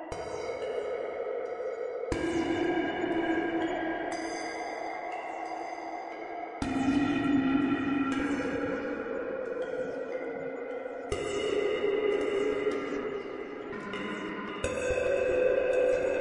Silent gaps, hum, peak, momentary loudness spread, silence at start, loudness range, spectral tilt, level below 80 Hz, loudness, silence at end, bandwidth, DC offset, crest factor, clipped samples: none; none; -16 dBFS; 11 LU; 0 s; 4 LU; -5.5 dB/octave; -54 dBFS; -32 LUFS; 0 s; 11.5 kHz; under 0.1%; 16 dB; under 0.1%